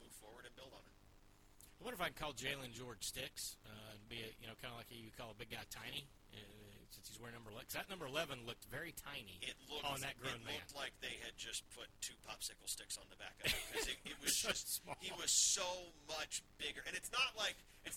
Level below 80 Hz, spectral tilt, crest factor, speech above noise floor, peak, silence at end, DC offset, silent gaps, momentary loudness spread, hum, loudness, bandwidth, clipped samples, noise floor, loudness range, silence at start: -66 dBFS; -1 dB/octave; 24 dB; 20 dB; -22 dBFS; 0 s; under 0.1%; none; 18 LU; none; -44 LUFS; 19 kHz; under 0.1%; -66 dBFS; 12 LU; 0 s